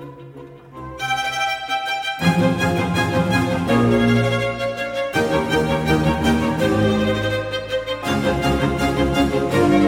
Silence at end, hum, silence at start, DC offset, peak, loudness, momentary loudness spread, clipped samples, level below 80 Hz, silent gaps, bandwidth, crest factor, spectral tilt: 0 s; none; 0 s; under 0.1%; -4 dBFS; -19 LUFS; 7 LU; under 0.1%; -36 dBFS; none; 17.5 kHz; 16 dB; -6 dB/octave